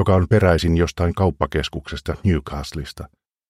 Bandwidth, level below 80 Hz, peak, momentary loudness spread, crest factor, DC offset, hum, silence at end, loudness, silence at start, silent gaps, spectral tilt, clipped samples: 13.5 kHz; -32 dBFS; -2 dBFS; 16 LU; 18 dB; under 0.1%; none; 0.45 s; -20 LUFS; 0 s; none; -7 dB/octave; under 0.1%